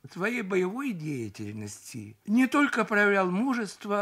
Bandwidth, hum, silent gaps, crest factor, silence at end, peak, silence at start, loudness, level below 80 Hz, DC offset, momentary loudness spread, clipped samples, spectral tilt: 15.5 kHz; none; none; 16 dB; 0 s; -12 dBFS; 0.05 s; -27 LUFS; -74 dBFS; under 0.1%; 16 LU; under 0.1%; -5.5 dB/octave